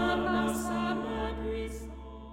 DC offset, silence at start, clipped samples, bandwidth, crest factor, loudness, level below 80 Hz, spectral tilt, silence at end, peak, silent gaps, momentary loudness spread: under 0.1%; 0 s; under 0.1%; 17 kHz; 14 dB; -32 LUFS; -44 dBFS; -5 dB/octave; 0 s; -18 dBFS; none; 14 LU